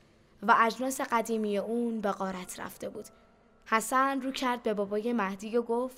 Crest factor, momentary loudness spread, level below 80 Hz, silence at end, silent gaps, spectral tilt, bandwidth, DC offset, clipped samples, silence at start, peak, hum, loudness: 22 dB; 14 LU; -66 dBFS; 0 s; none; -4 dB/octave; 16 kHz; under 0.1%; under 0.1%; 0.4 s; -10 dBFS; none; -30 LUFS